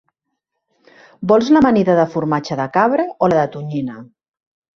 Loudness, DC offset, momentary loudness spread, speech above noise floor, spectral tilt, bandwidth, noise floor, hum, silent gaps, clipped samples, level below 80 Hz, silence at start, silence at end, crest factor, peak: -16 LUFS; under 0.1%; 12 LU; 61 dB; -7.5 dB/octave; 7.2 kHz; -76 dBFS; none; none; under 0.1%; -54 dBFS; 1.2 s; 0.7 s; 18 dB; 0 dBFS